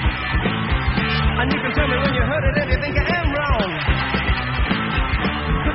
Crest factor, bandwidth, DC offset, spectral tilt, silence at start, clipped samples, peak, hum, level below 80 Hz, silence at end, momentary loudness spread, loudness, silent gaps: 14 dB; 5.8 kHz; under 0.1%; -4 dB/octave; 0 s; under 0.1%; -4 dBFS; none; -24 dBFS; 0 s; 2 LU; -20 LUFS; none